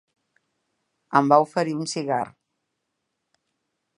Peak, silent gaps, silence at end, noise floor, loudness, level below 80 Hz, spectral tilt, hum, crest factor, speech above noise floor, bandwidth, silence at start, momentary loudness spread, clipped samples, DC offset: -2 dBFS; none; 1.7 s; -79 dBFS; -22 LUFS; -76 dBFS; -5.5 dB/octave; none; 24 dB; 58 dB; 11.5 kHz; 1.1 s; 10 LU; under 0.1%; under 0.1%